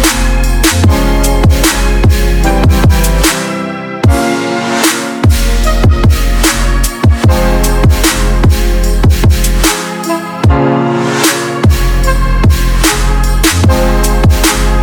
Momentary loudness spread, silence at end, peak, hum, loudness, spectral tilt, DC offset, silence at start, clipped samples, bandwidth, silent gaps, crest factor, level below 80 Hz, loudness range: 4 LU; 0 s; 0 dBFS; none; -10 LUFS; -4.5 dB/octave; under 0.1%; 0 s; 0.3%; 20 kHz; none; 8 dB; -12 dBFS; 1 LU